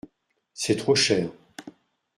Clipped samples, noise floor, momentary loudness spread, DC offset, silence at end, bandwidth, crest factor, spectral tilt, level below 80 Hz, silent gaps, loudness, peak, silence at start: under 0.1%; -69 dBFS; 24 LU; under 0.1%; 0.5 s; 14 kHz; 20 dB; -3.5 dB/octave; -64 dBFS; none; -23 LUFS; -8 dBFS; 0.55 s